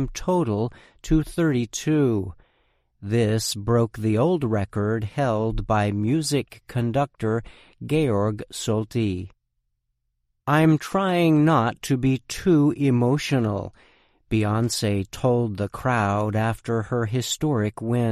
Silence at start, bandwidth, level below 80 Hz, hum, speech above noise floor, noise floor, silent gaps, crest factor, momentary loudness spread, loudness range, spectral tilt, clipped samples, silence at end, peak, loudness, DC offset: 0 s; 14.5 kHz; -44 dBFS; none; 53 dB; -75 dBFS; none; 16 dB; 8 LU; 4 LU; -6 dB/octave; under 0.1%; 0 s; -6 dBFS; -23 LUFS; under 0.1%